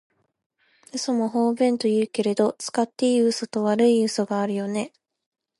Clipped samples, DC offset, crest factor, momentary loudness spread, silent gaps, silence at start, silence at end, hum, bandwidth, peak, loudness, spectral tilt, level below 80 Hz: under 0.1%; under 0.1%; 16 dB; 9 LU; none; 0.95 s; 0.7 s; none; 11.5 kHz; -6 dBFS; -23 LUFS; -5 dB/octave; -76 dBFS